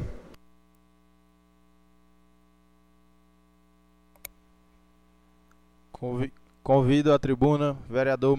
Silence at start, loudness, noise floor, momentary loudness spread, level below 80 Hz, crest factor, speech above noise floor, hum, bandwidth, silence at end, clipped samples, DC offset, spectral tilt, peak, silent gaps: 0 s; -25 LUFS; -62 dBFS; 24 LU; -50 dBFS; 20 dB; 39 dB; 60 Hz at -65 dBFS; 13.5 kHz; 0 s; under 0.1%; under 0.1%; -7.5 dB/octave; -10 dBFS; none